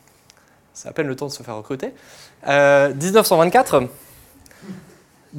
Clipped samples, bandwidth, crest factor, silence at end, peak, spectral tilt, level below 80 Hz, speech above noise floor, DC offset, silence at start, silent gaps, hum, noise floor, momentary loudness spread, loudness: under 0.1%; 17 kHz; 20 dB; 0 s; 0 dBFS; -4.5 dB/octave; -58 dBFS; 35 dB; under 0.1%; 0.75 s; none; none; -53 dBFS; 24 LU; -17 LUFS